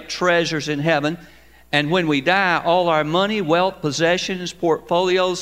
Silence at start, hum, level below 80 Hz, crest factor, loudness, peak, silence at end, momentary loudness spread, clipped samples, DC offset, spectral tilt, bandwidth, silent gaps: 0 s; none; -54 dBFS; 18 dB; -19 LUFS; -2 dBFS; 0 s; 5 LU; under 0.1%; 0.2%; -4.5 dB/octave; 16 kHz; none